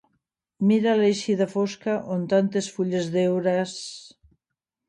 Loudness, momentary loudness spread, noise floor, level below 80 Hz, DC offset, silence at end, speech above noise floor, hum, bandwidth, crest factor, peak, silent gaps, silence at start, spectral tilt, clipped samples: -24 LUFS; 9 LU; -85 dBFS; -68 dBFS; under 0.1%; 0.8 s; 62 dB; none; 10.5 kHz; 16 dB; -8 dBFS; none; 0.6 s; -6 dB/octave; under 0.1%